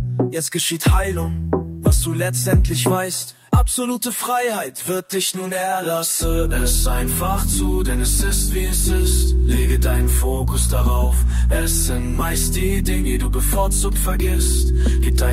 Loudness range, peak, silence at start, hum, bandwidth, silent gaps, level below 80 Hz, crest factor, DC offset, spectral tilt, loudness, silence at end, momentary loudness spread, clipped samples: 2 LU; -6 dBFS; 0 s; none; 16 kHz; none; -20 dBFS; 12 dB; under 0.1%; -4.5 dB/octave; -19 LUFS; 0 s; 4 LU; under 0.1%